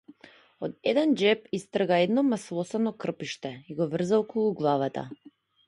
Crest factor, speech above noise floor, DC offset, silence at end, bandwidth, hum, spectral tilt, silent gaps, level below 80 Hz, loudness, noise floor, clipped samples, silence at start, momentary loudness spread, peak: 18 dB; 28 dB; under 0.1%; 0.55 s; 11.5 kHz; none; -6 dB/octave; none; -72 dBFS; -27 LUFS; -55 dBFS; under 0.1%; 0.6 s; 14 LU; -10 dBFS